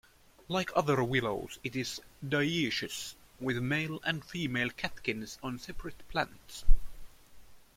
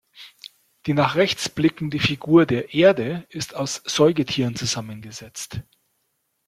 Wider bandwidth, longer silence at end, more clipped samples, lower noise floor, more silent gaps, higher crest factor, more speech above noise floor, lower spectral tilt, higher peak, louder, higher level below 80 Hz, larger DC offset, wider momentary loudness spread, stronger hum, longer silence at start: about the same, 15.5 kHz vs 15 kHz; second, 0.15 s vs 0.85 s; neither; second, -52 dBFS vs -72 dBFS; neither; about the same, 22 dB vs 20 dB; second, 22 dB vs 51 dB; about the same, -4.5 dB/octave vs -5 dB/octave; second, -8 dBFS vs -2 dBFS; second, -34 LUFS vs -21 LUFS; first, -38 dBFS vs -56 dBFS; neither; second, 11 LU vs 18 LU; neither; first, 0.5 s vs 0.2 s